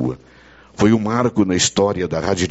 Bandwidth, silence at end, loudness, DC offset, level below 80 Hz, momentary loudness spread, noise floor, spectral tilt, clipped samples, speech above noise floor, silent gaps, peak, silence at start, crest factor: 8.2 kHz; 0 s; -18 LUFS; under 0.1%; -46 dBFS; 7 LU; -46 dBFS; -4.5 dB/octave; under 0.1%; 30 dB; none; -2 dBFS; 0 s; 16 dB